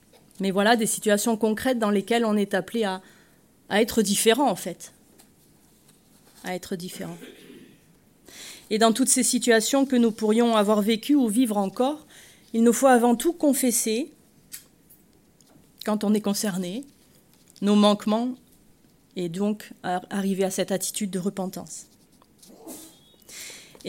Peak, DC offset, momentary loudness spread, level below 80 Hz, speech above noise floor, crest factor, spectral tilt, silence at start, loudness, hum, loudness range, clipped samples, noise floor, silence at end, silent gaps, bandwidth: -6 dBFS; under 0.1%; 20 LU; -64 dBFS; 35 dB; 20 dB; -4 dB/octave; 0.4 s; -23 LUFS; none; 9 LU; under 0.1%; -58 dBFS; 0 s; none; 16.5 kHz